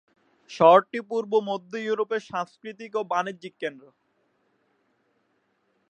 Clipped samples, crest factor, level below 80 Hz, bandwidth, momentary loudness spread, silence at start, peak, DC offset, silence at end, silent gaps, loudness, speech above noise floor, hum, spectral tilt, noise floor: under 0.1%; 24 dB; -76 dBFS; 9 kHz; 18 LU; 0.5 s; -4 dBFS; under 0.1%; 2.1 s; none; -25 LUFS; 46 dB; none; -5.5 dB/octave; -71 dBFS